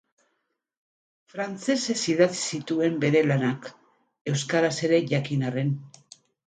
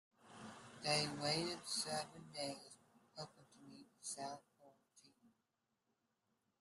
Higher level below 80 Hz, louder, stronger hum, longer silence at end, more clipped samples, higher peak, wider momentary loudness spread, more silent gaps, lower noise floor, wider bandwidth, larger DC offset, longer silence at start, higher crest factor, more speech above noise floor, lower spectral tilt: first, -70 dBFS vs -82 dBFS; first, -25 LUFS vs -43 LUFS; neither; second, 0.6 s vs 1.35 s; neither; first, -6 dBFS vs -24 dBFS; second, 12 LU vs 23 LU; first, 4.21-4.25 s vs none; second, -77 dBFS vs -88 dBFS; second, 9.4 kHz vs 13 kHz; neither; first, 1.35 s vs 0.2 s; about the same, 20 dB vs 24 dB; first, 53 dB vs 42 dB; first, -5 dB/octave vs -3 dB/octave